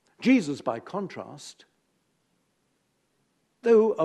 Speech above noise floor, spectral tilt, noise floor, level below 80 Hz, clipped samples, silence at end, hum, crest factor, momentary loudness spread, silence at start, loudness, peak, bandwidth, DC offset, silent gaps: 49 dB; -6 dB/octave; -73 dBFS; -80 dBFS; under 0.1%; 0 s; none; 18 dB; 21 LU; 0.2 s; -25 LUFS; -10 dBFS; 11 kHz; under 0.1%; none